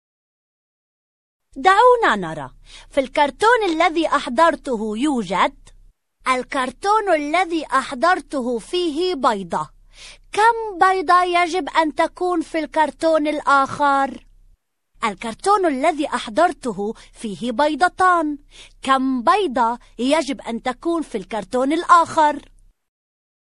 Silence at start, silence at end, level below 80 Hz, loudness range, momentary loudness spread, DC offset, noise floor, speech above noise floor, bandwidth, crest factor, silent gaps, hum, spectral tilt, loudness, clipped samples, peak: 1.55 s; 1.15 s; -50 dBFS; 3 LU; 11 LU; 0.1%; -57 dBFS; 38 dB; 11.5 kHz; 18 dB; none; none; -4 dB/octave; -19 LUFS; under 0.1%; 0 dBFS